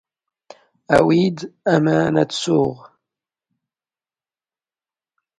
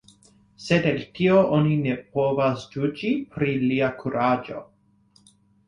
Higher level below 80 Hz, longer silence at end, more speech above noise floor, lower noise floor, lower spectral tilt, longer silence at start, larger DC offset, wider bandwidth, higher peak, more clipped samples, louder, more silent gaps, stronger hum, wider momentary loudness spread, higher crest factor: about the same, -54 dBFS vs -58 dBFS; first, 2.6 s vs 1.05 s; first, over 73 dB vs 38 dB; first, under -90 dBFS vs -60 dBFS; second, -6 dB/octave vs -7.5 dB/octave; first, 0.9 s vs 0.6 s; neither; about the same, 11.5 kHz vs 10.5 kHz; first, 0 dBFS vs -6 dBFS; neither; first, -18 LUFS vs -23 LUFS; neither; neither; about the same, 7 LU vs 8 LU; about the same, 20 dB vs 18 dB